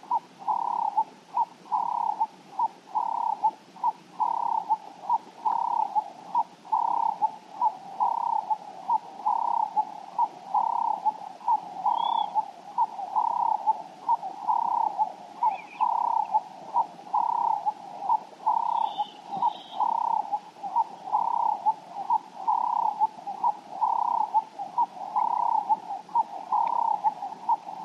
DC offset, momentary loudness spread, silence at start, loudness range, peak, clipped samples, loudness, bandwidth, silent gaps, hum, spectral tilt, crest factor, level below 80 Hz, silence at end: under 0.1%; 5 LU; 0.05 s; 2 LU; -12 dBFS; under 0.1%; -28 LUFS; 8.4 kHz; none; none; -4 dB/octave; 14 dB; under -90 dBFS; 0 s